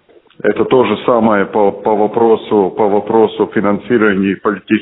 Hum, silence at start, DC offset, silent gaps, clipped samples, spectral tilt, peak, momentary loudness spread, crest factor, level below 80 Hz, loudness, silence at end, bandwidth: none; 0.45 s; under 0.1%; none; under 0.1%; -5 dB/octave; 0 dBFS; 4 LU; 12 dB; -52 dBFS; -13 LUFS; 0 s; 4 kHz